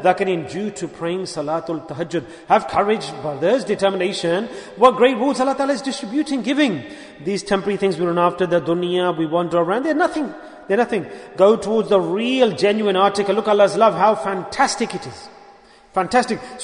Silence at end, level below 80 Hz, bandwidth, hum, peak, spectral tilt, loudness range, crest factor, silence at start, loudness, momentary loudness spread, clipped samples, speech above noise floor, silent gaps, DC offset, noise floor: 0 s; -58 dBFS; 11 kHz; none; 0 dBFS; -5 dB/octave; 4 LU; 18 dB; 0 s; -19 LUFS; 11 LU; under 0.1%; 28 dB; none; under 0.1%; -47 dBFS